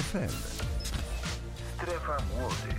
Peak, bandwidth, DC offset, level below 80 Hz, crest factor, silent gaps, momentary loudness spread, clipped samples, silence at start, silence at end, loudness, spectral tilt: -20 dBFS; 16.5 kHz; under 0.1%; -38 dBFS; 14 dB; none; 5 LU; under 0.1%; 0 s; 0 s; -35 LUFS; -4.5 dB/octave